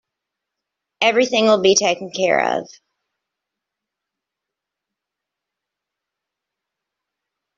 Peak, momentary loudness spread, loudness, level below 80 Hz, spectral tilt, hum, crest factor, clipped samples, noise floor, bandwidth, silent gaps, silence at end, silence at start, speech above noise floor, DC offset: -2 dBFS; 7 LU; -17 LUFS; -68 dBFS; -2.5 dB/octave; none; 20 dB; under 0.1%; -84 dBFS; 7.8 kHz; none; 4.95 s; 1 s; 67 dB; under 0.1%